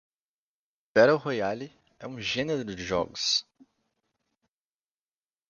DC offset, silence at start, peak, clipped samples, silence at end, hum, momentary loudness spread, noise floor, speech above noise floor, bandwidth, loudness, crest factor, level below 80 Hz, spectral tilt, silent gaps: under 0.1%; 0.95 s; -8 dBFS; under 0.1%; 2.05 s; none; 18 LU; under -90 dBFS; over 63 dB; 7.2 kHz; -27 LUFS; 24 dB; -62 dBFS; -3.5 dB/octave; none